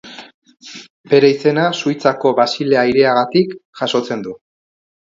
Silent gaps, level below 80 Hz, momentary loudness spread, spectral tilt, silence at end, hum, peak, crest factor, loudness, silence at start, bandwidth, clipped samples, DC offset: 0.34-0.42 s, 0.90-1.04 s, 3.65-3.73 s; -60 dBFS; 22 LU; -5.5 dB/octave; 0.7 s; none; 0 dBFS; 16 dB; -15 LUFS; 0.05 s; 7.6 kHz; under 0.1%; under 0.1%